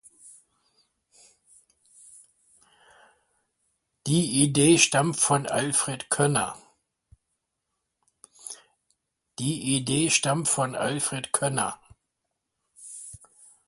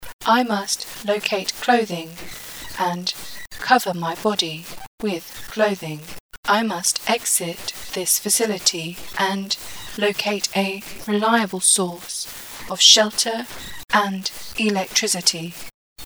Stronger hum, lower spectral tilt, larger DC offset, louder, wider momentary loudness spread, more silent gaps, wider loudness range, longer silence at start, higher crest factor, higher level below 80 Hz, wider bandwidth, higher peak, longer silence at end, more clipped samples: neither; first, -3.5 dB/octave vs -2 dB/octave; second, under 0.1% vs 0.3%; second, -23 LUFS vs -20 LUFS; first, 22 LU vs 16 LU; second, none vs 0.13-0.19 s, 4.87-4.98 s, 6.20-6.29 s, 6.37-6.43 s, 15.74-15.96 s; first, 11 LU vs 6 LU; first, 0.25 s vs 0 s; about the same, 24 dB vs 22 dB; second, -64 dBFS vs -54 dBFS; second, 11.5 kHz vs over 20 kHz; second, -4 dBFS vs 0 dBFS; first, 0.5 s vs 0 s; neither